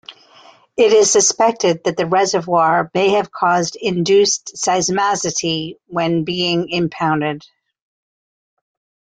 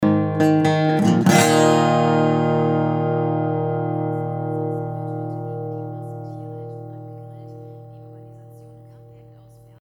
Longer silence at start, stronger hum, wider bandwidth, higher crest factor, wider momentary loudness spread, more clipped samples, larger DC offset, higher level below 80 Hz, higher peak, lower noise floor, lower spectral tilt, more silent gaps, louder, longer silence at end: about the same, 0.1 s vs 0 s; neither; second, 9.6 kHz vs 19.5 kHz; about the same, 16 dB vs 20 dB; second, 8 LU vs 23 LU; neither; neither; first, -58 dBFS vs -64 dBFS; about the same, -2 dBFS vs -2 dBFS; about the same, -47 dBFS vs -47 dBFS; second, -3.5 dB/octave vs -6 dB/octave; neither; first, -16 LUFS vs -19 LUFS; first, 1.8 s vs 0.75 s